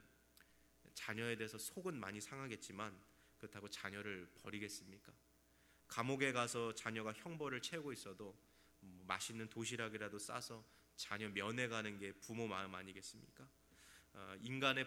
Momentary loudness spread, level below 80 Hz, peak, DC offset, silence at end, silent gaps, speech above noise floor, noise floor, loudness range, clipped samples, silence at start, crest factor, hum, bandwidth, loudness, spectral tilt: 19 LU; -80 dBFS; -20 dBFS; under 0.1%; 0 s; none; 26 dB; -73 dBFS; 6 LU; under 0.1%; 0 s; 28 dB; none; over 20 kHz; -46 LUFS; -3.5 dB/octave